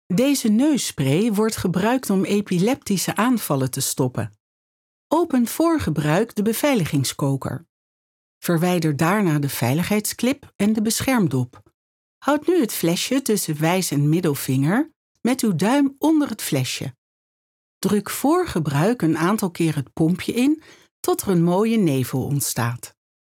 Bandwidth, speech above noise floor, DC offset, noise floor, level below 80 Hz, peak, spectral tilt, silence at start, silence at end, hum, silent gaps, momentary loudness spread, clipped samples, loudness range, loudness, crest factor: 18.5 kHz; over 70 dB; under 0.1%; under -90 dBFS; -56 dBFS; -4 dBFS; -5.5 dB/octave; 0.1 s; 0.4 s; none; 4.40-5.10 s, 7.69-8.41 s, 10.55-10.59 s, 11.74-12.21 s, 14.96-15.15 s, 16.98-17.81 s, 20.91-21.03 s; 6 LU; under 0.1%; 2 LU; -21 LUFS; 16 dB